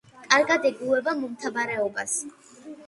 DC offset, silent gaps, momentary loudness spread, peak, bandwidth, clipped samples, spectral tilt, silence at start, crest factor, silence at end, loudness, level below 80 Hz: under 0.1%; none; 10 LU; -2 dBFS; 11.5 kHz; under 0.1%; -2 dB/octave; 0.15 s; 24 dB; 0 s; -24 LUFS; -72 dBFS